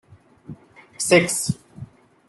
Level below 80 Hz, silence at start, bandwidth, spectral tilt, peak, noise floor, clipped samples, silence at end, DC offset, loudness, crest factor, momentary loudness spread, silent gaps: -58 dBFS; 0.5 s; 12.5 kHz; -3.5 dB/octave; -2 dBFS; -43 dBFS; under 0.1%; 0.45 s; under 0.1%; -20 LUFS; 22 dB; 26 LU; none